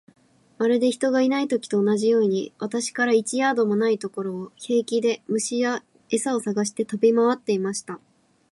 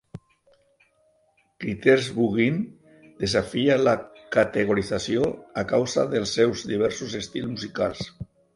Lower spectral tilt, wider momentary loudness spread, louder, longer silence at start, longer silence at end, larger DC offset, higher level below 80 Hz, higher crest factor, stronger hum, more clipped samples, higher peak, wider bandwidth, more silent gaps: about the same, -4.5 dB/octave vs -5 dB/octave; about the same, 9 LU vs 11 LU; about the same, -23 LUFS vs -24 LUFS; first, 0.6 s vs 0.15 s; first, 0.55 s vs 0.3 s; neither; second, -76 dBFS vs -54 dBFS; second, 16 dB vs 22 dB; neither; neither; second, -8 dBFS vs -4 dBFS; about the same, 11.5 kHz vs 11.5 kHz; neither